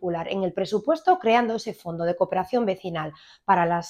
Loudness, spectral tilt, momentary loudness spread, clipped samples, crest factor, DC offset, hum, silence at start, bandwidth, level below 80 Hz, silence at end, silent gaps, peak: -24 LUFS; -6 dB/octave; 11 LU; under 0.1%; 18 dB; under 0.1%; none; 0 s; 15 kHz; -64 dBFS; 0 s; none; -6 dBFS